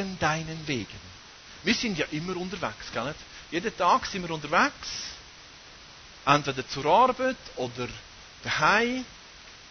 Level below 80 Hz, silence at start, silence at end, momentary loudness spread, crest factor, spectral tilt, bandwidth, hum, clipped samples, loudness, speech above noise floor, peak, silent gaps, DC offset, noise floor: -54 dBFS; 0 s; 0 s; 24 LU; 26 dB; -4 dB/octave; 6.6 kHz; none; under 0.1%; -27 LUFS; 21 dB; -4 dBFS; none; under 0.1%; -49 dBFS